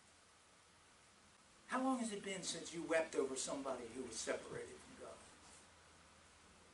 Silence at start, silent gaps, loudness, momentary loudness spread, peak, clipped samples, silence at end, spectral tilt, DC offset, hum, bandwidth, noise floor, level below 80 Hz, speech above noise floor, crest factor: 0 s; none; -43 LUFS; 26 LU; -24 dBFS; under 0.1%; 0 s; -3 dB/octave; under 0.1%; none; 11.5 kHz; -68 dBFS; -76 dBFS; 25 dB; 22 dB